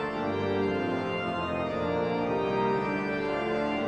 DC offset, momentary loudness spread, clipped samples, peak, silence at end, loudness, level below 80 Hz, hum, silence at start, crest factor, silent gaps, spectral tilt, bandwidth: under 0.1%; 3 LU; under 0.1%; -16 dBFS; 0 s; -29 LUFS; -56 dBFS; none; 0 s; 14 dB; none; -7 dB/octave; 8.8 kHz